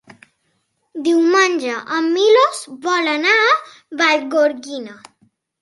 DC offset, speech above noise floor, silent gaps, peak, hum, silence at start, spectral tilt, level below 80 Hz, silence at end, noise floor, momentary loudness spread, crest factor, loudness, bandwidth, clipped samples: under 0.1%; 51 dB; none; -2 dBFS; none; 0.95 s; -1.5 dB/octave; -74 dBFS; 0.65 s; -67 dBFS; 17 LU; 16 dB; -16 LUFS; 11.5 kHz; under 0.1%